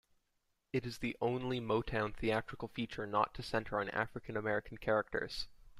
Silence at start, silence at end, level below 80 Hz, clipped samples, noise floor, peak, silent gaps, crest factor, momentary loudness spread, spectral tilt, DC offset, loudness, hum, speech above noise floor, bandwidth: 0.75 s; 0 s; -56 dBFS; under 0.1%; -81 dBFS; -16 dBFS; none; 22 dB; 6 LU; -6 dB/octave; under 0.1%; -38 LUFS; none; 44 dB; 14.5 kHz